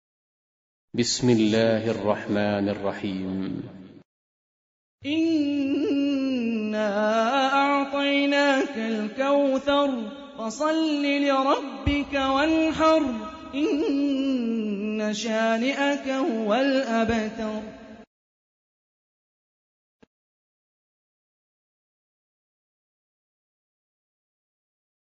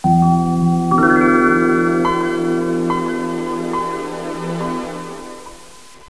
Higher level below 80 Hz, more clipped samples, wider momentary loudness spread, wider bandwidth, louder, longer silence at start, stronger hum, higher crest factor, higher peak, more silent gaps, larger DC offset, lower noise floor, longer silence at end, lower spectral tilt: about the same, -50 dBFS vs -46 dBFS; neither; second, 10 LU vs 16 LU; second, 8 kHz vs 11 kHz; second, -24 LUFS vs -17 LUFS; first, 0.95 s vs 0.05 s; neither; about the same, 18 dB vs 16 dB; second, -8 dBFS vs -2 dBFS; first, 4.05-4.98 s vs none; second, under 0.1% vs 0.8%; first, under -90 dBFS vs -42 dBFS; first, 7 s vs 0.4 s; second, -5 dB/octave vs -7 dB/octave